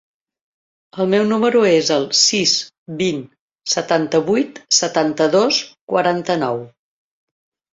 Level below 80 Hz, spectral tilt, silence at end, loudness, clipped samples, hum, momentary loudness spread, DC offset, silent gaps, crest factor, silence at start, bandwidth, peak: -62 dBFS; -3 dB/octave; 1.05 s; -16 LUFS; under 0.1%; none; 10 LU; under 0.1%; 2.78-2.86 s, 3.41-3.48 s, 5.81-5.88 s; 18 dB; 0.95 s; 7.8 kHz; -2 dBFS